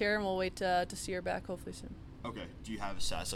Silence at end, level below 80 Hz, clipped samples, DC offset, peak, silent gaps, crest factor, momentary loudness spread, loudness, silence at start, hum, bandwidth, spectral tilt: 0 s; -50 dBFS; under 0.1%; under 0.1%; -20 dBFS; none; 14 dB; 13 LU; -37 LUFS; 0 s; none; 16.5 kHz; -4 dB/octave